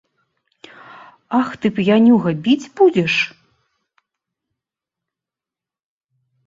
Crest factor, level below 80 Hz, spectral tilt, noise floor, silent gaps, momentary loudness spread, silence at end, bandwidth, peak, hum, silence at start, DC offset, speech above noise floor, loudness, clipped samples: 18 dB; -62 dBFS; -6.5 dB/octave; -88 dBFS; none; 8 LU; 3.2 s; 7.6 kHz; -2 dBFS; none; 1.3 s; under 0.1%; 73 dB; -16 LUFS; under 0.1%